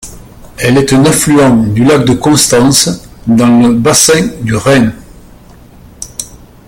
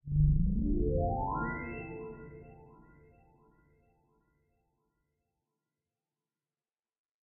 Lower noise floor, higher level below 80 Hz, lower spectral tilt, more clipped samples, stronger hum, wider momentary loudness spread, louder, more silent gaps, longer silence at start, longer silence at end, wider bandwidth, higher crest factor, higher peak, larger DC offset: second, -35 dBFS vs under -90 dBFS; first, -34 dBFS vs -40 dBFS; second, -4.5 dB/octave vs -7 dB/octave; first, 0.2% vs under 0.1%; first, 60 Hz at -25 dBFS vs none; second, 15 LU vs 21 LU; first, -8 LUFS vs -33 LUFS; neither; about the same, 0.05 s vs 0.05 s; second, 0.3 s vs 4.6 s; first, over 20 kHz vs 2.8 kHz; second, 10 dB vs 20 dB; first, 0 dBFS vs -16 dBFS; neither